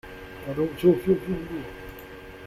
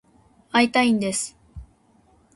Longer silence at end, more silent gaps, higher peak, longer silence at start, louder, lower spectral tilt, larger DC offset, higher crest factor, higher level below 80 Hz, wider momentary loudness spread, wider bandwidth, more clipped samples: second, 0 s vs 0.7 s; neither; about the same, -8 dBFS vs -6 dBFS; second, 0.05 s vs 0.55 s; second, -25 LUFS vs -21 LUFS; first, -8 dB/octave vs -3.5 dB/octave; neither; about the same, 20 dB vs 20 dB; about the same, -48 dBFS vs -52 dBFS; first, 20 LU vs 9 LU; first, 15.5 kHz vs 11.5 kHz; neither